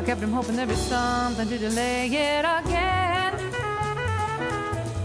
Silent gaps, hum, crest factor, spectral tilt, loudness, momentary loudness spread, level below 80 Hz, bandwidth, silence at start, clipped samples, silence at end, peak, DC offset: none; none; 16 dB; -4.5 dB/octave; -25 LUFS; 5 LU; -40 dBFS; 11 kHz; 0 s; under 0.1%; 0 s; -8 dBFS; under 0.1%